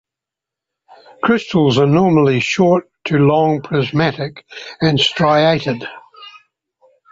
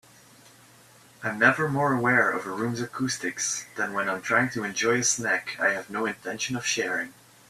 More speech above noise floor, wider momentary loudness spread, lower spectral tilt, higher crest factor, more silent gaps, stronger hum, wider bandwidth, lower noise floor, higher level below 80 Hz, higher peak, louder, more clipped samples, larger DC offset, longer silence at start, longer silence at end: first, 71 dB vs 28 dB; first, 14 LU vs 9 LU; first, -6.5 dB/octave vs -3 dB/octave; second, 14 dB vs 22 dB; neither; neither; second, 7.8 kHz vs 15 kHz; first, -85 dBFS vs -54 dBFS; first, -52 dBFS vs -68 dBFS; about the same, -2 dBFS vs -4 dBFS; first, -15 LUFS vs -25 LUFS; neither; neither; about the same, 1.25 s vs 1.2 s; first, 0.8 s vs 0.4 s